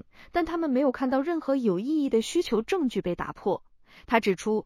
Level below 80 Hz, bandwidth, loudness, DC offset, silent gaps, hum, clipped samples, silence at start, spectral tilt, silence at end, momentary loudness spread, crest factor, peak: -54 dBFS; 15 kHz; -27 LUFS; under 0.1%; none; none; under 0.1%; 0.2 s; -5.5 dB/octave; 0.05 s; 6 LU; 20 dB; -8 dBFS